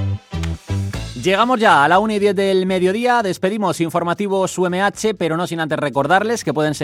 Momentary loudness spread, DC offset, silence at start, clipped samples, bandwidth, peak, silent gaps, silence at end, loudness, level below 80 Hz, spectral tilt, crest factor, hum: 11 LU; under 0.1%; 0 s; under 0.1%; 15.5 kHz; -2 dBFS; none; 0 s; -17 LUFS; -42 dBFS; -5 dB/octave; 16 dB; none